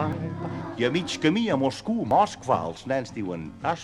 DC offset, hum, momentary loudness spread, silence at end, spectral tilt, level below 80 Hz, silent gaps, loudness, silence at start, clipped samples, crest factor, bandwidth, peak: under 0.1%; none; 10 LU; 0 s; -5.5 dB/octave; -56 dBFS; none; -26 LUFS; 0 s; under 0.1%; 18 dB; 11.5 kHz; -8 dBFS